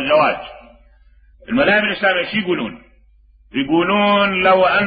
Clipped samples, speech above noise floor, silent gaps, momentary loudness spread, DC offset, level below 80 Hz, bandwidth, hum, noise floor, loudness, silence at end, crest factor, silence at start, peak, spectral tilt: under 0.1%; 35 dB; none; 13 LU; under 0.1%; -48 dBFS; 5 kHz; none; -50 dBFS; -16 LUFS; 0 s; 14 dB; 0 s; -2 dBFS; -10 dB/octave